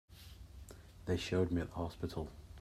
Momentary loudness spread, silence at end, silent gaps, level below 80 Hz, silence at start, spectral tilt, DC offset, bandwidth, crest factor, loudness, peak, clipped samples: 20 LU; 0 s; none; -56 dBFS; 0.1 s; -6.5 dB/octave; under 0.1%; 15 kHz; 20 dB; -39 LUFS; -20 dBFS; under 0.1%